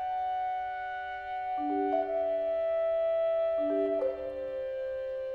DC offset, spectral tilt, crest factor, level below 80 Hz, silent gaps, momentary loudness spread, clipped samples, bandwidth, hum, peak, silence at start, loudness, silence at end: under 0.1%; -6.5 dB/octave; 12 dB; -62 dBFS; none; 8 LU; under 0.1%; 4.7 kHz; none; -18 dBFS; 0 s; -32 LUFS; 0 s